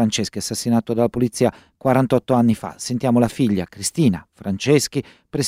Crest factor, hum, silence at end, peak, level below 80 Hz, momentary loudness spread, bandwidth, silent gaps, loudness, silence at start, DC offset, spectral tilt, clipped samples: 16 dB; none; 0 s; -2 dBFS; -52 dBFS; 7 LU; 15.5 kHz; none; -20 LUFS; 0 s; under 0.1%; -5.5 dB/octave; under 0.1%